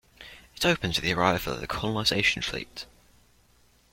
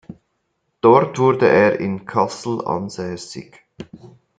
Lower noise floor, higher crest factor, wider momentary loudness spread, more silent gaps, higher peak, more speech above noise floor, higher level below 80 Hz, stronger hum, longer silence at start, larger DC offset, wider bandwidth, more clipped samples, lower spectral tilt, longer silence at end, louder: second, -62 dBFS vs -71 dBFS; about the same, 22 dB vs 18 dB; about the same, 22 LU vs 22 LU; neither; second, -8 dBFS vs 0 dBFS; second, 35 dB vs 53 dB; first, -50 dBFS vs -60 dBFS; first, 60 Hz at -55 dBFS vs none; about the same, 0.2 s vs 0.1 s; neither; first, 16.5 kHz vs 9.2 kHz; neither; second, -4 dB/octave vs -6.5 dB/octave; first, 1.1 s vs 0.3 s; second, -26 LUFS vs -17 LUFS